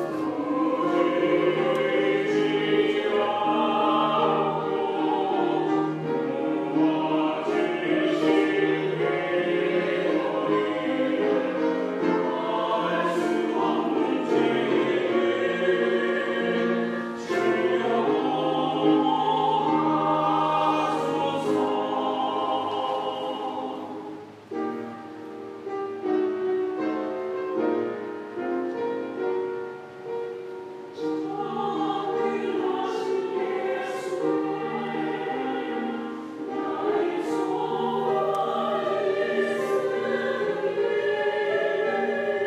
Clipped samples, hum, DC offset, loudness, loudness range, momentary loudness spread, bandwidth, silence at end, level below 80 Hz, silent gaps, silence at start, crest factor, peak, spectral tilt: under 0.1%; none; under 0.1%; -25 LUFS; 7 LU; 9 LU; 11.5 kHz; 0 s; -76 dBFS; none; 0 s; 16 dB; -10 dBFS; -6 dB/octave